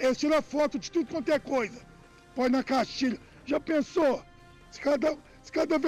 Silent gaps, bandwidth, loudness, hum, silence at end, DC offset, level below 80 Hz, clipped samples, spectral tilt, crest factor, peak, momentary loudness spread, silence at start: none; 15 kHz; -29 LUFS; none; 0 s; under 0.1%; -58 dBFS; under 0.1%; -4.5 dB/octave; 10 dB; -18 dBFS; 10 LU; 0 s